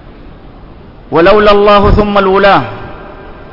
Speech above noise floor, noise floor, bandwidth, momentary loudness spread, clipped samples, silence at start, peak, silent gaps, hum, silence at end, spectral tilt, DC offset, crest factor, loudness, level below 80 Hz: 26 dB; -32 dBFS; 6 kHz; 20 LU; 0.3%; 0.05 s; 0 dBFS; none; none; 0 s; -7.5 dB/octave; under 0.1%; 10 dB; -7 LUFS; -22 dBFS